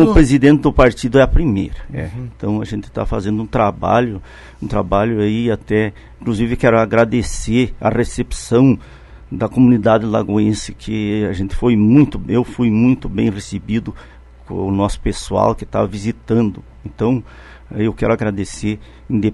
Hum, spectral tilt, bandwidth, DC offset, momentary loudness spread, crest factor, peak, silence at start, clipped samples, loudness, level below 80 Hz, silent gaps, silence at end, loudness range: none; -7 dB/octave; 11.5 kHz; under 0.1%; 12 LU; 16 dB; 0 dBFS; 0 s; under 0.1%; -16 LUFS; -28 dBFS; none; 0 s; 4 LU